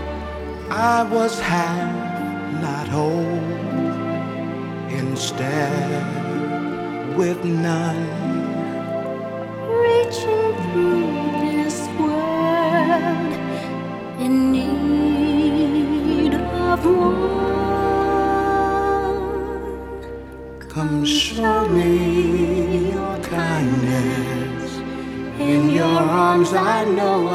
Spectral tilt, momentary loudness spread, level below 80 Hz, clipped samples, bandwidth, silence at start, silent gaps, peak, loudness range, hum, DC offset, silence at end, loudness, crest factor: -6 dB/octave; 10 LU; -40 dBFS; under 0.1%; 15 kHz; 0 s; none; -4 dBFS; 5 LU; none; under 0.1%; 0 s; -20 LUFS; 16 dB